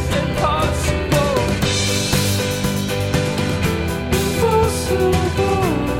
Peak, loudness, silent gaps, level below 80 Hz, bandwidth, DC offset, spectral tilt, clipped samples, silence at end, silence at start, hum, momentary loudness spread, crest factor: -4 dBFS; -18 LUFS; none; -30 dBFS; 17.5 kHz; 0.5%; -5 dB/octave; under 0.1%; 0 s; 0 s; none; 3 LU; 14 dB